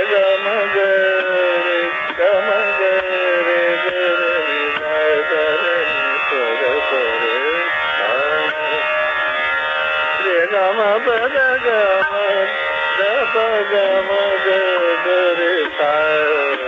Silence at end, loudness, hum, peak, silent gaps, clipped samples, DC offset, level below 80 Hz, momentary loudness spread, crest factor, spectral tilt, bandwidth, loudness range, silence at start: 0 s; -16 LUFS; none; -4 dBFS; none; under 0.1%; under 0.1%; -58 dBFS; 2 LU; 12 dB; -4 dB/octave; 7.6 kHz; 1 LU; 0 s